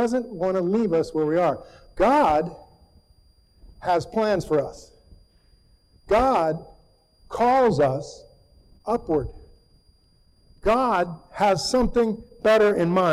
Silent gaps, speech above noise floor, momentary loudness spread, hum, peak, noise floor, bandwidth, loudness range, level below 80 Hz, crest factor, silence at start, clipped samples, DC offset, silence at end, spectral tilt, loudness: none; 38 dB; 14 LU; none; -12 dBFS; -59 dBFS; 14.5 kHz; 5 LU; -44 dBFS; 12 dB; 0 s; under 0.1%; under 0.1%; 0 s; -6 dB/octave; -22 LUFS